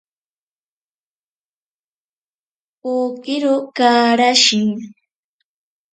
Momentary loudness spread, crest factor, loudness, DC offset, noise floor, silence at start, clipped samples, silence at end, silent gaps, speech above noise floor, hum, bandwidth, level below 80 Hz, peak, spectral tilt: 12 LU; 20 dB; -15 LUFS; under 0.1%; under -90 dBFS; 2.85 s; under 0.1%; 1 s; none; over 74 dB; none; 9.4 kHz; -70 dBFS; 0 dBFS; -2.5 dB/octave